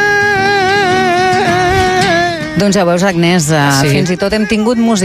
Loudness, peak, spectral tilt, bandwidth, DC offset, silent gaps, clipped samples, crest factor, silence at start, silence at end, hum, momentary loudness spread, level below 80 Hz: -11 LUFS; 0 dBFS; -4.5 dB/octave; 15.5 kHz; under 0.1%; none; under 0.1%; 10 dB; 0 s; 0 s; none; 3 LU; -34 dBFS